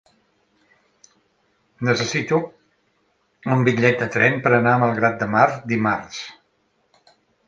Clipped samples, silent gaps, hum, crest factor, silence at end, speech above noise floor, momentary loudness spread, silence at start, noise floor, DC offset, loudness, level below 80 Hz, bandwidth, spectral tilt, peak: under 0.1%; none; none; 22 dB; 1.15 s; 47 dB; 15 LU; 1.8 s; -66 dBFS; under 0.1%; -19 LUFS; -60 dBFS; 7.6 kHz; -6 dB/octave; 0 dBFS